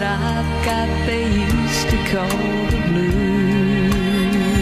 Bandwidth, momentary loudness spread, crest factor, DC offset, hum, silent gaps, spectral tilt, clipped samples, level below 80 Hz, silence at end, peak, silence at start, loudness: 15.5 kHz; 3 LU; 12 dB; under 0.1%; none; none; -5.5 dB/octave; under 0.1%; -28 dBFS; 0 s; -6 dBFS; 0 s; -18 LUFS